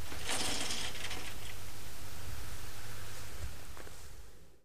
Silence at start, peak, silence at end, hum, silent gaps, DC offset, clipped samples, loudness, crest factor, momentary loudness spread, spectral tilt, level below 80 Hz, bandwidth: 0 s; -20 dBFS; 0 s; none; none; 3%; under 0.1%; -41 LUFS; 18 dB; 16 LU; -2 dB/octave; -52 dBFS; 15.5 kHz